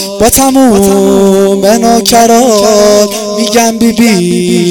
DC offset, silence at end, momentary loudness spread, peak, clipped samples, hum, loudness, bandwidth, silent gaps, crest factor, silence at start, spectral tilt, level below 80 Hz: under 0.1%; 0 s; 4 LU; 0 dBFS; 4%; none; -6 LUFS; over 20 kHz; none; 6 dB; 0 s; -4 dB/octave; -32 dBFS